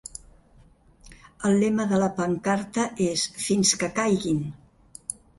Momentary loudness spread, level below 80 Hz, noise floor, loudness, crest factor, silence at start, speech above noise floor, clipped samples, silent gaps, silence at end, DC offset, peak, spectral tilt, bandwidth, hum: 15 LU; -56 dBFS; -55 dBFS; -24 LUFS; 18 dB; 0.15 s; 32 dB; under 0.1%; none; 0.25 s; under 0.1%; -8 dBFS; -4 dB/octave; 11.5 kHz; none